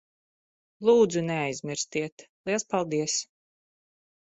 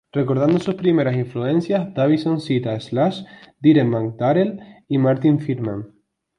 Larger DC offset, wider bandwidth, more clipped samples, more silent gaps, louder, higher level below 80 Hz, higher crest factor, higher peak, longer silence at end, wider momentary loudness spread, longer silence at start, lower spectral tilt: neither; second, 8.4 kHz vs 10 kHz; neither; first, 2.12-2.17 s, 2.29-2.44 s vs none; second, -27 LUFS vs -20 LUFS; second, -70 dBFS vs -58 dBFS; about the same, 20 dB vs 16 dB; second, -10 dBFS vs -4 dBFS; first, 1.1 s vs 0.5 s; first, 13 LU vs 8 LU; first, 0.8 s vs 0.15 s; second, -4 dB/octave vs -8.5 dB/octave